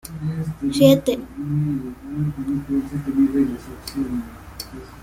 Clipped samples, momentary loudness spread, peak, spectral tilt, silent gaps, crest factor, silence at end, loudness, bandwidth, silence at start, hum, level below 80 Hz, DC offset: under 0.1%; 18 LU; -2 dBFS; -7 dB/octave; none; 20 dB; 0 s; -22 LUFS; 16 kHz; 0.05 s; none; -44 dBFS; under 0.1%